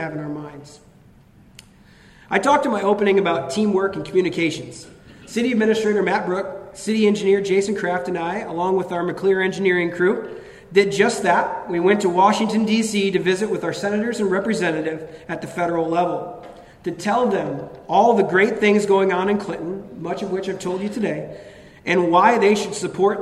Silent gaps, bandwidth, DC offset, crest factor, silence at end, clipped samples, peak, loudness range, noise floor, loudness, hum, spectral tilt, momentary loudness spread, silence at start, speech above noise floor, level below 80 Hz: none; 12.5 kHz; under 0.1%; 18 dB; 0 s; under 0.1%; -2 dBFS; 4 LU; -50 dBFS; -20 LUFS; none; -5 dB/octave; 14 LU; 0 s; 30 dB; -56 dBFS